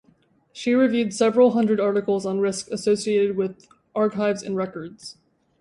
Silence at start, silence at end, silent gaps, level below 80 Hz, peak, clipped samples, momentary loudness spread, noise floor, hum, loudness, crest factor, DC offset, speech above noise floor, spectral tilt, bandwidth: 0.55 s; 0.5 s; none; -66 dBFS; -6 dBFS; under 0.1%; 13 LU; -61 dBFS; none; -22 LUFS; 16 dB; under 0.1%; 39 dB; -5.5 dB/octave; 11.5 kHz